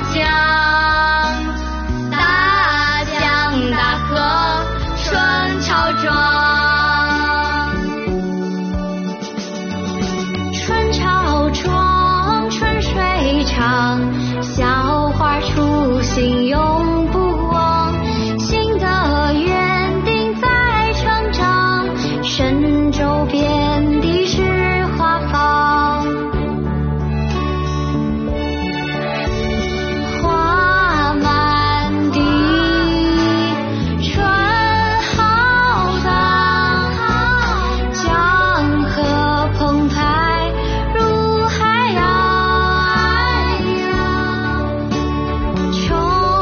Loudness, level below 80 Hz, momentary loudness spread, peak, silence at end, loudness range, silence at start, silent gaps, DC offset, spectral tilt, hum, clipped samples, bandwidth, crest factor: -16 LUFS; -26 dBFS; 7 LU; -2 dBFS; 0 s; 4 LU; 0 s; none; under 0.1%; -3.5 dB/octave; none; under 0.1%; 6.8 kHz; 14 dB